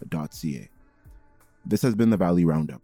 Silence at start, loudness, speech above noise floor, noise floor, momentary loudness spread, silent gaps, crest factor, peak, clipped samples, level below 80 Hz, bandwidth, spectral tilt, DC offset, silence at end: 0 s; -24 LUFS; 31 dB; -55 dBFS; 14 LU; none; 14 dB; -10 dBFS; under 0.1%; -54 dBFS; 18.5 kHz; -7.5 dB/octave; under 0.1%; 0.05 s